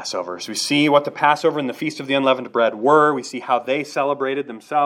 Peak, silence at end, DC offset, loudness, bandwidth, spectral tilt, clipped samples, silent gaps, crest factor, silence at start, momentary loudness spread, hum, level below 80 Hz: 0 dBFS; 0 s; under 0.1%; -19 LUFS; 16.5 kHz; -4 dB/octave; under 0.1%; none; 18 dB; 0 s; 11 LU; none; -78 dBFS